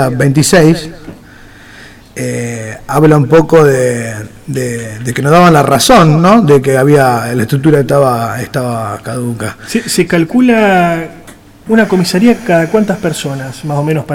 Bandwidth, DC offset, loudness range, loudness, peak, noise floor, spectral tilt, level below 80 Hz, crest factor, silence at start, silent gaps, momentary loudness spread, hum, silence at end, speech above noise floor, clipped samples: 17 kHz; under 0.1%; 5 LU; -10 LUFS; 0 dBFS; -35 dBFS; -5.5 dB/octave; -38 dBFS; 10 dB; 0 s; none; 13 LU; none; 0 s; 26 dB; 0.9%